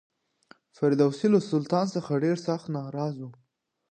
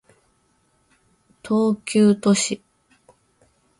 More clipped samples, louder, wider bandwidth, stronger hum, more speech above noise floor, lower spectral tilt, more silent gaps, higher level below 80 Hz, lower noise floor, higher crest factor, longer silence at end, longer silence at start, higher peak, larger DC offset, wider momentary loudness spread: neither; second, -27 LUFS vs -20 LUFS; second, 9.6 kHz vs 11.5 kHz; neither; second, 33 dB vs 46 dB; first, -7.5 dB/octave vs -5 dB/octave; neither; second, -76 dBFS vs -64 dBFS; second, -59 dBFS vs -64 dBFS; about the same, 18 dB vs 18 dB; second, 0.6 s vs 1.25 s; second, 0.8 s vs 1.45 s; second, -10 dBFS vs -6 dBFS; neither; about the same, 10 LU vs 9 LU